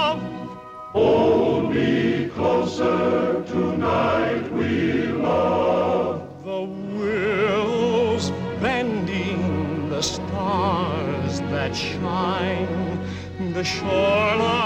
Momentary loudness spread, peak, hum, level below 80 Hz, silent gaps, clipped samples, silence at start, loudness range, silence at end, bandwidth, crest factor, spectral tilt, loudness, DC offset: 9 LU; -6 dBFS; none; -52 dBFS; none; under 0.1%; 0 s; 3 LU; 0 s; 9.2 kHz; 14 dB; -6 dB/octave; -22 LUFS; under 0.1%